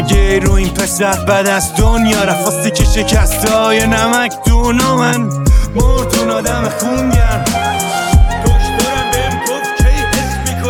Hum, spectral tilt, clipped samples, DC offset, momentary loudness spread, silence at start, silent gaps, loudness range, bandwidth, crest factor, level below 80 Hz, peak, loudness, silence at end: none; -4.5 dB/octave; under 0.1%; under 0.1%; 4 LU; 0 s; none; 2 LU; 18.5 kHz; 12 dB; -16 dBFS; 0 dBFS; -13 LUFS; 0 s